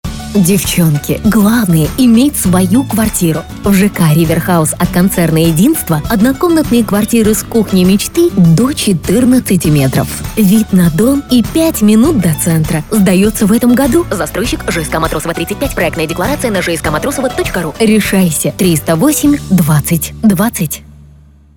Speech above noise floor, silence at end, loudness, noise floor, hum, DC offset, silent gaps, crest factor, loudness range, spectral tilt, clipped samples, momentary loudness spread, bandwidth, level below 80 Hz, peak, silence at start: 30 dB; 0.75 s; -11 LUFS; -40 dBFS; none; under 0.1%; none; 10 dB; 3 LU; -5.5 dB/octave; under 0.1%; 6 LU; 19.5 kHz; -30 dBFS; 0 dBFS; 0.05 s